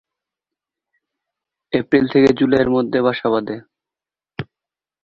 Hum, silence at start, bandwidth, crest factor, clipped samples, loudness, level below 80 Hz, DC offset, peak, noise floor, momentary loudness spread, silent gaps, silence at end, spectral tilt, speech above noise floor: none; 1.7 s; 7.4 kHz; 18 dB; under 0.1%; -17 LUFS; -52 dBFS; under 0.1%; -2 dBFS; -89 dBFS; 19 LU; none; 0.6 s; -7.5 dB/octave; 73 dB